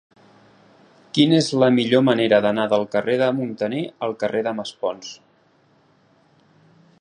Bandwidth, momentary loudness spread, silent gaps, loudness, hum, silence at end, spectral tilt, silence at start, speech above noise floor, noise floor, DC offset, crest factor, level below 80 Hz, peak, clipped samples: 10.5 kHz; 11 LU; none; -20 LUFS; none; 1.85 s; -5.5 dB/octave; 1.15 s; 39 dB; -59 dBFS; under 0.1%; 20 dB; -66 dBFS; -2 dBFS; under 0.1%